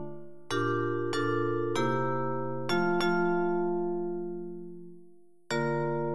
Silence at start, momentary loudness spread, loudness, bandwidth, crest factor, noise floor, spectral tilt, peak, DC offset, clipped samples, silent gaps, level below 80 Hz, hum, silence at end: 0 s; 14 LU; -30 LUFS; 12 kHz; 14 dB; -58 dBFS; -6.5 dB/octave; -16 dBFS; 0.9%; under 0.1%; none; -68 dBFS; none; 0 s